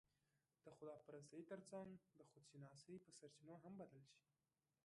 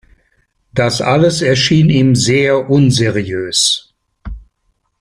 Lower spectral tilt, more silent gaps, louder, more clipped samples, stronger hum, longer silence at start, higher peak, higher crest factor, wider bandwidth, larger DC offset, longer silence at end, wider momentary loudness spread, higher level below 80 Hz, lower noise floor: about the same, -5.5 dB/octave vs -4.5 dB/octave; neither; second, -61 LUFS vs -12 LUFS; neither; neither; about the same, 0.65 s vs 0.75 s; second, -44 dBFS vs -2 dBFS; first, 18 dB vs 12 dB; second, 11 kHz vs 15 kHz; neither; about the same, 0.65 s vs 0.6 s; about the same, 8 LU vs 10 LU; second, under -90 dBFS vs -40 dBFS; first, under -90 dBFS vs -64 dBFS